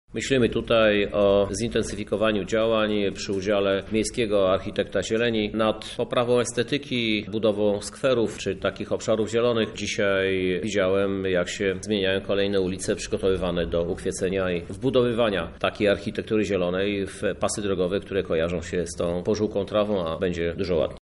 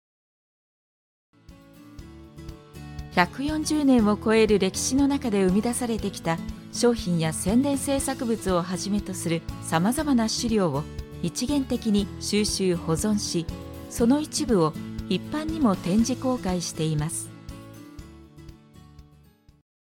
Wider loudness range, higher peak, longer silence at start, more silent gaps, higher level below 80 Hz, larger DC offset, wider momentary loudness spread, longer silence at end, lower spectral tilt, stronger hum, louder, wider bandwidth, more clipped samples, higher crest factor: second, 2 LU vs 6 LU; second, -8 dBFS vs -4 dBFS; second, 0.1 s vs 1.5 s; neither; about the same, -46 dBFS vs -44 dBFS; neither; second, 5 LU vs 18 LU; second, 0.05 s vs 0.8 s; about the same, -5 dB/octave vs -5 dB/octave; neither; about the same, -24 LUFS vs -25 LUFS; second, 11.5 kHz vs 17 kHz; neither; second, 16 dB vs 22 dB